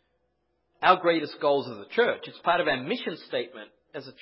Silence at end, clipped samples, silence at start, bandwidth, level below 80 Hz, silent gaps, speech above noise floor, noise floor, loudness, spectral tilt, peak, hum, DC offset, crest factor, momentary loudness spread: 0.1 s; under 0.1%; 0.8 s; 5.8 kHz; -72 dBFS; none; 48 dB; -75 dBFS; -26 LUFS; -8.5 dB/octave; -4 dBFS; none; under 0.1%; 22 dB; 19 LU